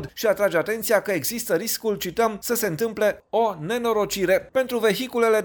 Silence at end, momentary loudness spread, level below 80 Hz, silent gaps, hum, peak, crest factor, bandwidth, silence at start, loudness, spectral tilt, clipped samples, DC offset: 0 s; 3 LU; -56 dBFS; none; none; -6 dBFS; 16 dB; over 20 kHz; 0 s; -23 LUFS; -3.5 dB/octave; under 0.1%; under 0.1%